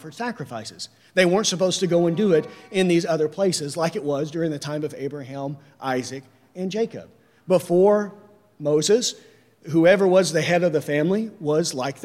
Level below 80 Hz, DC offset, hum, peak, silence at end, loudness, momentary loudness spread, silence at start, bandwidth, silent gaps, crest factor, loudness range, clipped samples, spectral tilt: -70 dBFS; under 0.1%; none; -4 dBFS; 0 s; -22 LUFS; 15 LU; 0.05 s; 15.5 kHz; none; 18 dB; 8 LU; under 0.1%; -5 dB/octave